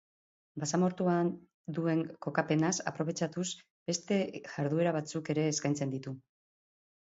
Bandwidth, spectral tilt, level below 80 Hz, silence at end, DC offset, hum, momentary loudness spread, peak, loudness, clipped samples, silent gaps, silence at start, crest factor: 8 kHz; -5 dB/octave; -74 dBFS; 0.8 s; under 0.1%; none; 11 LU; -12 dBFS; -33 LUFS; under 0.1%; 1.54-1.64 s, 3.70-3.86 s; 0.55 s; 20 dB